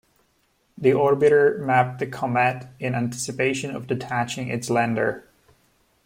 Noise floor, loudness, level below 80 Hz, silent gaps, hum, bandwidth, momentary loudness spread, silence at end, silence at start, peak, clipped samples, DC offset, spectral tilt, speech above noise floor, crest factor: -66 dBFS; -22 LUFS; -62 dBFS; none; none; 16 kHz; 11 LU; 0.85 s; 0.8 s; -6 dBFS; under 0.1%; under 0.1%; -5.5 dB/octave; 44 dB; 18 dB